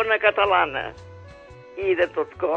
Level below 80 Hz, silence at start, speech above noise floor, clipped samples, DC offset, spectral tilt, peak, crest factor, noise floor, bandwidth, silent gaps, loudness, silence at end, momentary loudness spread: -52 dBFS; 0 s; 22 dB; under 0.1%; under 0.1%; -6 dB/octave; -4 dBFS; 20 dB; -44 dBFS; 7.6 kHz; none; -22 LUFS; 0 s; 18 LU